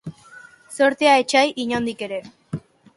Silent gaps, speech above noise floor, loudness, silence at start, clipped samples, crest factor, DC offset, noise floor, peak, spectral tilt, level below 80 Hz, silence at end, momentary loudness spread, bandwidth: none; 27 dB; -19 LUFS; 0.05 s; under 0.1%; 18 dB; under 0.1%; -46 dBFS; -4 dBFS; -4 dB/octave; -60 dBFS; 0.35 s; 19 LU; 11.5 kHz